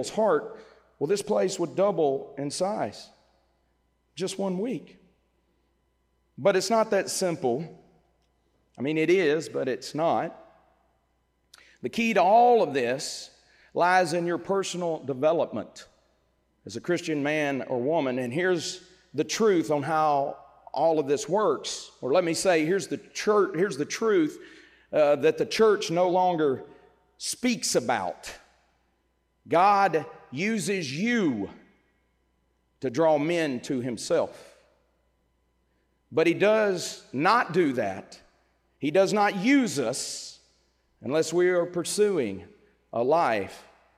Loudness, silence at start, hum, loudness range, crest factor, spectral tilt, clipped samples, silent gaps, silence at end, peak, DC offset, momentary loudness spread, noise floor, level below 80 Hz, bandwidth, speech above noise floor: -26 LUFS; 0 s; none; 5 LU; 18 dB; -4.5 dB/octave; under 0.1%; none; 0.35 s; -10 dBFS; under 0.1%; 13 LU; -72 dBFS; -70 dBFS; 16 kHz; 46 dB